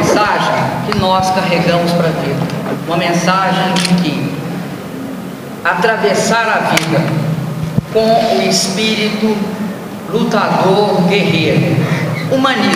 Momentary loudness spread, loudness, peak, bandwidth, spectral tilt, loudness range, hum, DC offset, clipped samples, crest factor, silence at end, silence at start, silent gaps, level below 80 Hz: 9 LU; -13 LUFS; 0 dBFS; 16 kHz; -5 dB/octave; 2 LU; none; under 0.1%; under 0.1%; 14 dB; 0 s; 0 s; none; -46 dBFS